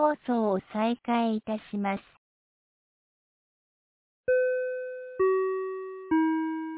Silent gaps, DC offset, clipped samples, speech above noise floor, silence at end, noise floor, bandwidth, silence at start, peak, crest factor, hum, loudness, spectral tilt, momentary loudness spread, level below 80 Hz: 2.18-4.24 s; under 0.1%; under 0.1%; over 61 dB; 0 s; under -90 dBFS; 4 kHz; 0 s; -12 dBFS; 18 dB; none; -29 LUFS; -5 dB/octave; 10 LU; -68 dBFS